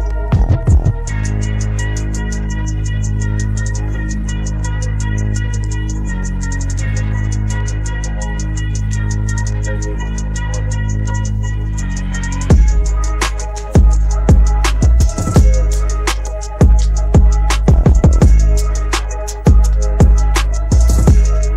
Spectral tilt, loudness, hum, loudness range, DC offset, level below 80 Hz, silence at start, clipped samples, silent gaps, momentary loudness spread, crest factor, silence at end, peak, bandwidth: -6 dB/octave; -16 LUFS; none; 7 LU; 0.1%; -14 dBFS; 0 s; under 0.1%; none; 9 LU; 12 dB; 0 s; -2 dBFS; 11.5 kHz